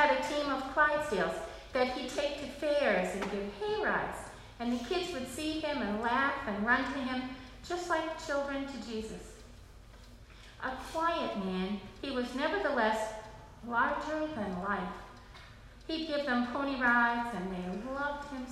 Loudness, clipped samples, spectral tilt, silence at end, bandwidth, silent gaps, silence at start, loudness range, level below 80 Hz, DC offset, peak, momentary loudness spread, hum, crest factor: -33 LUFS; under 0.1%; -4.5 dB/octave; 0 s; 14.5 kHz; none; 0 s; 6 LU; -56 dBFS; under 0.1%; -14 dBFS; 16 LU; none; 20 dB